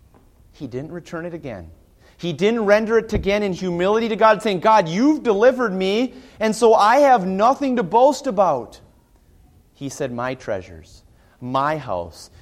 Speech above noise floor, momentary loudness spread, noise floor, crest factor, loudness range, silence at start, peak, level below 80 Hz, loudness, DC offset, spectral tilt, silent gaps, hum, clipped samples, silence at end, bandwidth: 35 dB; 16 LU; -53 dBFS; 16 dB; 11 LU; 0.6 s; -2 dBFS; -44 dBFS; -18 LUFS; under 0.1%; -5.5 dB/octave; none; none; under 0.1%; 0.15 s; 15 kHz